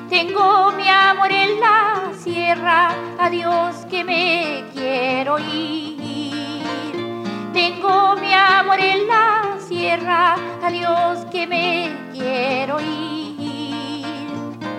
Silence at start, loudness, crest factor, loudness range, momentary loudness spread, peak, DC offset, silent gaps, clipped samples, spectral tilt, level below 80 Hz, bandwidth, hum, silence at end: 0 s; -18 LUFS; 16 dB; 6 LU; 13 LU; -2 dBFS; under 0.1%; none; under 0.1%; -4.5 dB/octave; -72 dBFS; 13 kHz; none; 0 s